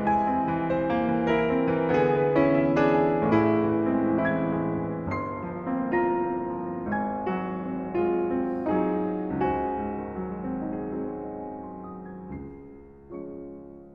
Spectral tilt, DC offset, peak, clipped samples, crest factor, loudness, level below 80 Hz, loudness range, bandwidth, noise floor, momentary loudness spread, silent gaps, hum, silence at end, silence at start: -9.5 dB/octave; under 0.1%; -10 dBFS; under 0.1%; 16 dB; -26 LUFS; -52 dBFS; 12 LU; 6.6 kHz; -46 dBFS; 17 LU; none; none; 0 s; 0 s